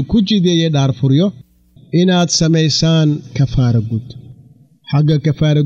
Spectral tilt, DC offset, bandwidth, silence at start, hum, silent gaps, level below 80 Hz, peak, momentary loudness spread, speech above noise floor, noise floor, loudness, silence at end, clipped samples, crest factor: -6 dB/octave; under 0.1%; 7.8 kHz; 0 s; none; none; -38 dBFS; -4 dBFS; 7 LU; 32 dB; -45 dBFS; -14 LUFS; 0 s; under 0.1%; 10 dB